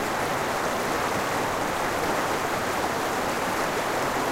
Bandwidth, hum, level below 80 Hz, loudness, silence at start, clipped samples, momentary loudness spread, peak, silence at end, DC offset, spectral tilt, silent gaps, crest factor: 16 kHz; none; -50 dBFS; -26 LUFS; 0 s; under 0.1%; 1 LU; -14 dBFS; 0 s; under 0.1%; -3.5 dB/octave; none; 14 dB